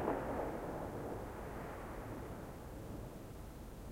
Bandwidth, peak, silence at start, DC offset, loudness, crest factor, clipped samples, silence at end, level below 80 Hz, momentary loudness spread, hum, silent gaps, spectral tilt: 16 kHz; -22 dBFS; 0 s; under 0.1%; -46 LUFS; 22 dB; under 0.1%; 0 s; -54 dBFS; 10 LU; none; none; -7 dB/octave